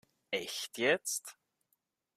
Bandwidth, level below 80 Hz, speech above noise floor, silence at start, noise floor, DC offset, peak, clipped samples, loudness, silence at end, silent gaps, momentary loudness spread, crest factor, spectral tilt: 16 kHz; -84 dBFS; 46 dB; 0.3 s; -81 dBFS; under 0.1%; -14 dBFS; under 0.1%; -34 LUFS; 0.85 s; none; 9 LU; 24 dB; -1.5 dB/octave